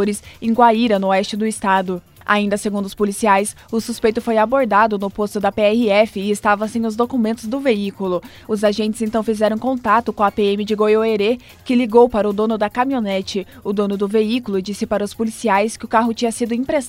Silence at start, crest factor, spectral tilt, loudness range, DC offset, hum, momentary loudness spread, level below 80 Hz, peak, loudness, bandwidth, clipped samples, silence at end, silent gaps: 0 s; 16 dB; -5 dB/octave; 3 LU; under 0.1%; none; 8 LU; -50 dBFS; 0 dBFS; -18 LUFS; 16 kHz; under 0.1%; 0 s; none